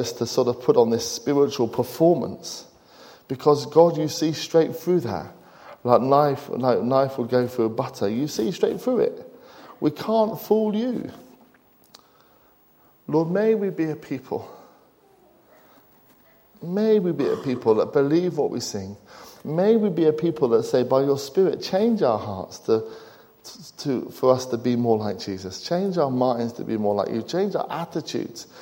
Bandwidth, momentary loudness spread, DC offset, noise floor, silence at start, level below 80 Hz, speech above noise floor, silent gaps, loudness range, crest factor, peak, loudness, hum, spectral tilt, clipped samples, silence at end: 16.5 kHz; 13 LU; under 0.1%; -57 dBFS; 0 s; -66 dBFS; 35 dB; none; 6 LU; 20 dB; -2 dBFS; -23 LUFS; none; -6 dB/octave; under 0.1%; 0 s